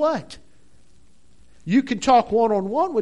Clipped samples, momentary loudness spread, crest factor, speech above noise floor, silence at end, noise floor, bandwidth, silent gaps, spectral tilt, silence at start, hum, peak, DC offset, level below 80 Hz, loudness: under 0.1%; 16 LU; 18 dB; 38 dB; 0 s; -58 dBFS; 11 kHz; none; -5.5 dB/octave; 0 s; none; -4 dBFS; 0.5%; -52 dBFS; -20 LUFS